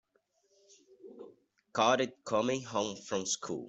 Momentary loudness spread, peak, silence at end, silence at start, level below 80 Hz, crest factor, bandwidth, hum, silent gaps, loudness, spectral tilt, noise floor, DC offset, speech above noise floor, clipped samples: 22 LU; -14 dBFS; 0 s; 1.05 s; -76 dBFS; 22 dB; 8.2 kHz; none; none; -32 LUFS; -3 dB/octave; -75 dBFS; under 0.1%; 42 dB; under 0.1%